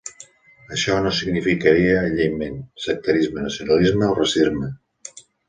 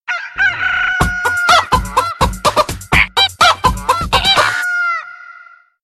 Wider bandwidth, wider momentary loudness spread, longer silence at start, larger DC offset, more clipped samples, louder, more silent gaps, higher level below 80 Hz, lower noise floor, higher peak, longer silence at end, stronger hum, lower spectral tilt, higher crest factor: second, 9.8 kHz vs 13 kHz; first, 16 LU vs 7 LU; about the same, 0.05 s vs 0.1 s; neither; neither; second, -20 LUFS vs -13 LUFS; neither; second, -44 dBFS vs -28 dBFS; first, -47 dBFS vs -42 dBFS; about the same, -2 dBFS vs 0 dBFS; second, 0.3 s vs 0.5 s; neither; first, -5 dB/octave vs -2.5 dB/octave; about the same, 18 dB vs 14 dB